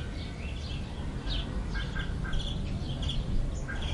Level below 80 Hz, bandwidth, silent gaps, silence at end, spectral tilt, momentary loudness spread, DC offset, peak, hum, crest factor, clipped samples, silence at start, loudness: -34 dBFS; 11 kHz; none; 0 s; -5.5 dB/octave; 4 LU; under 0.1%; -18 dBFS; none; 14 dB; under 0.1%; 0 s; -35 LUFS